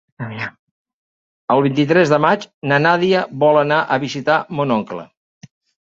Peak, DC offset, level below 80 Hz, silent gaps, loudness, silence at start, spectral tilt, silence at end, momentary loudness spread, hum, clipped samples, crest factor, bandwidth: 0 dBFS; under 0.1%; -60 dBFS; 0.59-0.85 s, 0.93-1.48 s, 2.54-2.61 s; -16 LUFS; 0.2 s; -6.5 dB/octave; 0.8 s; 15 LU; none; under 0.1%; 18 dB; 7.6 kHz